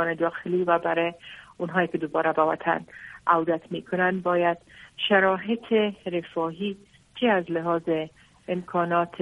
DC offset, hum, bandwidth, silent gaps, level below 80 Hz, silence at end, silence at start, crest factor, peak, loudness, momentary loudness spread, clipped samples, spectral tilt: under 0.1%; none; 10.5 kHz; none; -66 dBFS; 0 s; 0 s; 20 dB; -6 dBFS; -25 LUFS; 12 LU; under 0.1%; -7 dB/octave